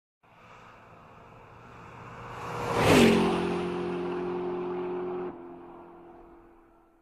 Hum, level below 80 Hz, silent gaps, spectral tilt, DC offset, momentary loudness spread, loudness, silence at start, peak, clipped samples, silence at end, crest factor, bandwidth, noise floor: none; -54 dBFS; none; -5.5 dB/octave; under 0.1%; 27 LU; -27 LUFS; 0.5 s; -8 dBFS; under 0.1%; 0.7 s; 22 dB; 15 kHz; -59 dBFS